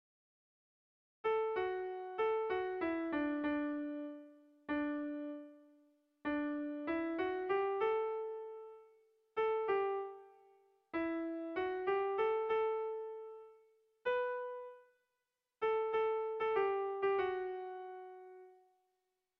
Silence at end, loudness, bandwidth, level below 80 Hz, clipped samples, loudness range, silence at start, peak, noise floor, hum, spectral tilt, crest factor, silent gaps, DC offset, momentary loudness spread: 0.85 s; -38 LUFS; 5.4 kHz; -74 dBFS; under 0.1%; 4 LU; 1.25 s; -24 dBFS; -88 dBFS; none; -2.5 dB/octave; 16 dB; none; under 0.1%; 15 LU